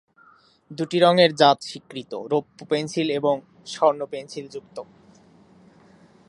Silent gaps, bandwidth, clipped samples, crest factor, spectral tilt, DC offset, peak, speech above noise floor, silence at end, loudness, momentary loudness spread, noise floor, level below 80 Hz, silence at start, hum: none; 11.5 kHz; under 0.1%; 22 dB; -5 dB/octave; under 0.1%; -2 dBFS; 34 dB; 1.45 s; -22 LUFS; 21 LU; -56 dBFS; -72 dBFS; 0.7 s; none